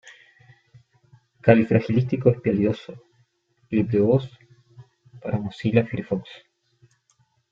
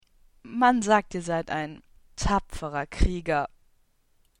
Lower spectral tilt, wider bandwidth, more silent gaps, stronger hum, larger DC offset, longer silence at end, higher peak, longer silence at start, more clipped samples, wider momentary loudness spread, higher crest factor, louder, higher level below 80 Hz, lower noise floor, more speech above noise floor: first, -9.5 dB/octave vs -5 dB/octave; second, 7.2 kHz vs 11.5 kHz; neither; neither; neither; first, 1.15 s vs 0.95 s; first, -2 dBFS vs -8 dBFS; second, 0.05 s vs 0.45 s; neither; about the same, 15 LU vs 14 LU; about the same, 22 dB vs 20 dB; first, -22 LUFS vs -27 LUFS; second, -58 dBFS vs -36 dBFS; about the same, -66 dBFS vs -65 dBFS; first, 45 dB vs 40 dB